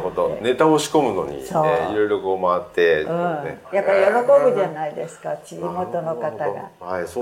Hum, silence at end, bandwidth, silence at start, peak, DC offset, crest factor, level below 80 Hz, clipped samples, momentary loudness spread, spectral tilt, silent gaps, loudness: none; 0 s; 16.5 kHz; 0 s; -4 dBFS; under 0.1%; 16 dB; -56 dBFS; under 0.1%; 13 LU; -5 dB/octave; none; -20 LUFS